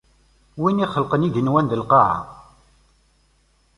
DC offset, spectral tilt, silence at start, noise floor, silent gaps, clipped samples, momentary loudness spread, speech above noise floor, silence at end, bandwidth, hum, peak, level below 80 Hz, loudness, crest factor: under 0.1%; -8.5 dB/octave; 0.55 s; -61 dBFS; none; under 0.1%; 12 LU; 42 dB; 1.35 s; 11 kHz; none; -2 dBFS; -52 dBFS; -19 LUFS; 20 dB